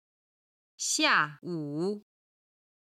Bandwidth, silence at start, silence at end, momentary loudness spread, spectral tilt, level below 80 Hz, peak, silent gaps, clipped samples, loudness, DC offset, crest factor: 16 kHz; 0.8 s; 0.8 s; 13 LU; -2 dB/octave; -82 dBFS; -10 dBFS; none; under 0.1%; -28 LUFS; under 0.1%; 22 dB